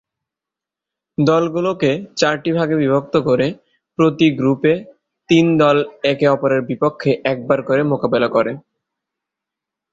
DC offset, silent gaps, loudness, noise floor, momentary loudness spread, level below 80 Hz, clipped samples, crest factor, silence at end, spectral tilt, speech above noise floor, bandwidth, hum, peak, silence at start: under 0.1%; none; -17 LUFS; -86 dBFS; 6 LU; -56 dBFS; under 0.1%; 16 dB; 1.35 s; -6.5 dB/octave; 70 dB; 7.6 kHz; none; -2 dBFS; 1.2 s